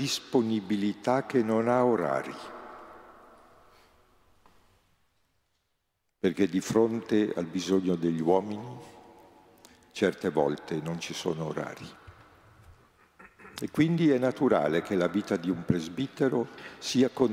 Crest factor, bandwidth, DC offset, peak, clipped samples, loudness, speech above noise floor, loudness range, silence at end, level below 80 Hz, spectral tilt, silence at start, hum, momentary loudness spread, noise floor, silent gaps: 20 dB; 16 kHz; under 0.1%; -10 dBFS; under 0.1%; -28 LUFS; 50 dB; 8 LU; 0 s; -68 dBFS; -6 dB/octave; 0 s; none; 15 LU; -78 dBFS; none